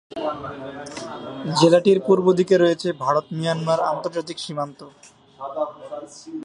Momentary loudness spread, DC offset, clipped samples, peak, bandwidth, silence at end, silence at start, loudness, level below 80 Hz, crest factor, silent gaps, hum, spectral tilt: 17 LU; under 0.1%; under 0.1%; -2 dBFS; 11 kHz; 0 s; 0.1 s; -21 LUFS; -64 dBFS; 18 dB; none; none; -6 dB/octave